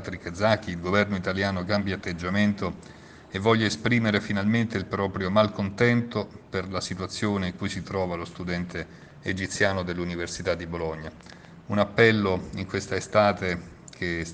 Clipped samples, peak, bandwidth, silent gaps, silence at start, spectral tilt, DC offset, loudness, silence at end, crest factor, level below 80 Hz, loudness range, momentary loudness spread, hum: under 0.1%; -4 dBFS; 9.6 kHz; none; 0 s; -5.5 dB/octave; under 0.1%; -26 LUFS; 0 s; 24 dB; -52 dBFS; 5 LU; 12 LU; none